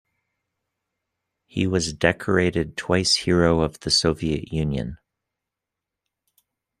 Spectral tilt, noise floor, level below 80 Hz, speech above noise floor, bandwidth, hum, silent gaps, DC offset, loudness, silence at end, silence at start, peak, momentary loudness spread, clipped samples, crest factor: -4.5 dB/octave; -86 dBFS; -46 dBFS; 64 dB; 13 kHz; none; none; under 0.1%; -22 LUFS; 1.85 s; 1.55 s; -2 dBFS; 8 LU; under 0.1%; 22 dB